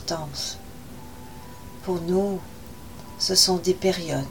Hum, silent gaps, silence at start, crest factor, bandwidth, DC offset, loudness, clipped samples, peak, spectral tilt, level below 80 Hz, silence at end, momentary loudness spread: none; none; 0 s; 22 dB; 17.5 kHz; 0.6%; -23 LUFS; under 0.1%; -4 dBFS; -3.5 dB/octave; -48 dBFS; 0 s; 24 LU